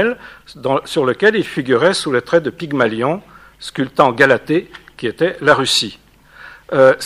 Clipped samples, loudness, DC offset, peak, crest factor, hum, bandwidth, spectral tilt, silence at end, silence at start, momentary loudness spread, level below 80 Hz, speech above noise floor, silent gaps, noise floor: under 0.1%; -16 LUFS; under 0.1%; 0 dBFS; 16 dB; none; 15 kHz; -4.5 dB/octave; 0 s; 0 s; 13 LU; -54 dBFS; 25 dB; none; -41 dBFS